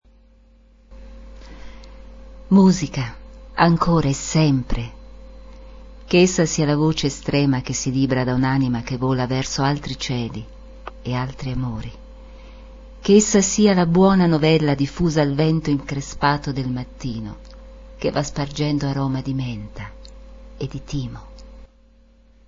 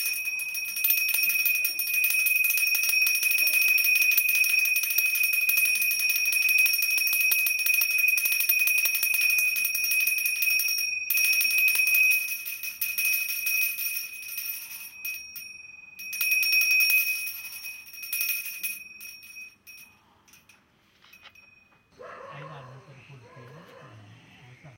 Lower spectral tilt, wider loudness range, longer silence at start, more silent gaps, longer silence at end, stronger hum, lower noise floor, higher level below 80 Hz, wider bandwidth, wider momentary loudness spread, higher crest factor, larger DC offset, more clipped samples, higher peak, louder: first, -5.5 dB/octave vs 2.5 dB/octave; about the same, 9 LU vs 9 LU; first, 0.9 s vs 0 s; neither; first, 0.85 s vs 0.05 s; neither; second, -52 dBFS vs -62 dBFS; first, -38 dBFS vs -78 dBFS; second, 7.6 kHz vs 17.5 kHz; about the same, 17 LU vs 18 LU; about the same, 20 dB vs 18 dB; neither; neither; first, -2 dBFS vs -8 dBFS; about the same, -20 LUFS vs -22 LUFS